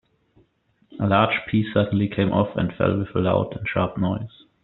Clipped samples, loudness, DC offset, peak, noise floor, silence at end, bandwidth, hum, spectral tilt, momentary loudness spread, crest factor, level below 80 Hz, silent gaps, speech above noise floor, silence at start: under 0.1%; -22 LUFS; under 0.1%; -2 dBFS; -64 dBFS; 0.35 s; 4.2 kHz; none; -6 dB/octave; 6 LU; 20 dB; -52 dBFS; none; 42 dB; 0.9 s